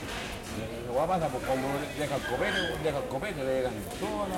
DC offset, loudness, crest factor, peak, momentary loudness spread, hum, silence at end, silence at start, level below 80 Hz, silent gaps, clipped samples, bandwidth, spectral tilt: under 0.1%; -31 LUFS; 14 dB; -16 dBFS; 8 LU; none; 0 s; 0 s; -48 dBFS; none; under 0.1%; 16.5 kHz; -4.5 dB/octave